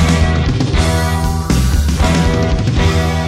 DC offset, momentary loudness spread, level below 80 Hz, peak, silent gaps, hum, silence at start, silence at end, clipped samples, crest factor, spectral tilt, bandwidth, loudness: under 0.1%; 2 LU; -18 dBFS; -2 dBFS; none; none; 0 s; 0 s; under 0.1%; 12 dB; -5.5 dB/octave; 15.5 kHz; -14 LUFS